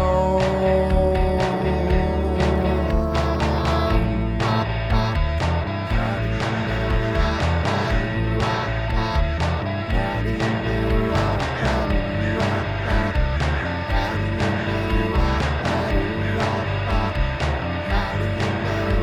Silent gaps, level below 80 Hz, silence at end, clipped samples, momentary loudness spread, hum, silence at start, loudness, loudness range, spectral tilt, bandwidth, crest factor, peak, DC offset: none; -26 dBFS; 0 s; under 0.1%; 4 LU; none; 0 s; -22 LUFS; 2 LU; -7 dB/octave; 12 kHz; 14 dB; -6 dBFS; under 0.1%